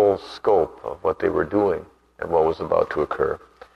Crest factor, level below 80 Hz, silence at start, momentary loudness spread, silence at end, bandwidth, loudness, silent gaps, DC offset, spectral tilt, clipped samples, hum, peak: 16 dB; -50 dBFS; 0 s; 7 LU; 0.4 s; 9.2 kHz; -23 LUFS; none; under 0.1%; -7.5 dB/octave; under 0.1%; none; -6 dBFS